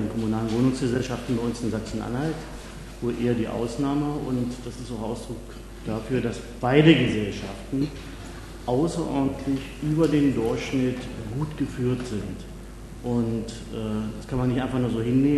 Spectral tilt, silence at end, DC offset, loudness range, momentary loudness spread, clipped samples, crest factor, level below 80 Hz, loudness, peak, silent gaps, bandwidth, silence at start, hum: -6.5 dB/octave; 0 s; under 0.1%; 5 LU; 14 LU; under 0.1%; 24 dB; -42 dBFS; -26 LUFS; -2 dBFS; none; 13 kHz; 0 s; none